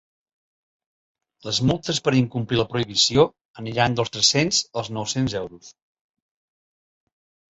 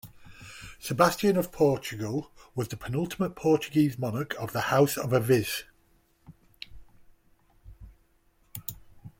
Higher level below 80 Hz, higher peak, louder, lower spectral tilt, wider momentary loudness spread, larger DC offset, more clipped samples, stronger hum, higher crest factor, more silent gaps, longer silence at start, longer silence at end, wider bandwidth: about the same, -52 dBFS vs -56 dBFS; about the same, -4 dBFS vs -6 dBFS; first, -21 LUFS vs -27 LUFS; second, -4 dB/octave vs -5.5 dB/octave; second, 12 LU vs 21 LU; neither; neither; neither; about the same, 20 dB vs 22 dB; first, 3.41-3.54 s vs none; first, 1.45 s vs 0.05 s; first, 1.85 s vs 0.1 s; second, 8.2 kHz vs 16.5 kHz